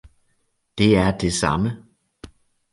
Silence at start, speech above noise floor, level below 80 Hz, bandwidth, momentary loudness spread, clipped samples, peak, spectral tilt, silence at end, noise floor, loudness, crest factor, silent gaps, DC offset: 0.75 s; 49 dB; -40 dBFS; 11.5 kHz; 18 LU; under 0.1%; -2 dBFS; -5.5 dB/octave; 0.45 s; -68 dBFS; -20 LUFS; 20 dB; none; under 0.1%